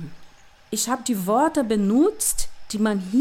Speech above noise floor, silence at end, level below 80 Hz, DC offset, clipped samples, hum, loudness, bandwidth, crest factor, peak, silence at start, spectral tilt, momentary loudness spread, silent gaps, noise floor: 26 dB; 0 s; -42 dBFS; under 0.1%; under 0.1%; none; -22 LUFS; 17 kHz; 14 dB; -10 dBFS; 0 s; -4.5 dB/octave; 10 LU; none; -47 dBFS